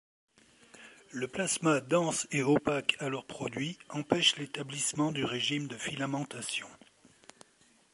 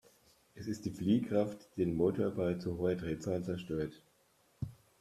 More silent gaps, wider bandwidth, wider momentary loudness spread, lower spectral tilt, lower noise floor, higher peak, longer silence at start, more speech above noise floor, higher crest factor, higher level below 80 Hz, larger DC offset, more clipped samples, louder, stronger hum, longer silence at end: neither; second, 11.5 kHz vs 14 kHz; second, 11 LU vs 14 LU; second, -3.5 dB/octave vs -7.5 dB/octave; second, -66 dBFS vs -71 dBFS; first, -8 dBFS vs -18 dBFS; first, 0.75 s vs 0.55 s; about the same, 34 dB vs 36 dB; first, 24 dB vs 18 dB; second, -70 dBFS vs -62 dBFS; neither; neither; first, -31 LUFS vs -36 LUFS; neither; first, 1.2 s vs 0.25 s